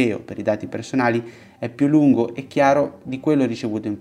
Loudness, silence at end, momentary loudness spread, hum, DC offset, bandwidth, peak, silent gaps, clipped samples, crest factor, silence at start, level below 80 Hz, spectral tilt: -20 LUFS; 0 s; 10 LU; none; under 0.1%; 10 kHz; -4 dBFS; none; under 0.1%; 16 dB; 0 s; -62 dBFS; -7 dB/octave